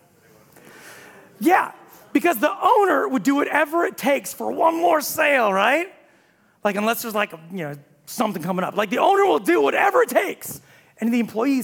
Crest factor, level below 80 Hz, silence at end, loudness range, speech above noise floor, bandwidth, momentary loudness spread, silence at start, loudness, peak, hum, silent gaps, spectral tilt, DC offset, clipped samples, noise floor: 18 dB; -72 dBFS; 0 s; 4 LU; 38 dB; 18 kHz; 14 LU; 0.85 s; -20 LUFS; -4 dBFS; none; none; -4 dB/octave; under 0.1%; under 0.1%; -58 dBFS